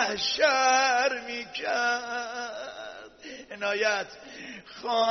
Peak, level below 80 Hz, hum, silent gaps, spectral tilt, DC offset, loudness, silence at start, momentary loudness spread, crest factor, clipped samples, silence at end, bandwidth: -10 dBFS; -68 dBFS; none; none; 1.5 dB/octave; under 0.1%; -26 LUFS; 0 s; 20 LU; 18 dB; under 0.1%; 0 s; 6.4 kHz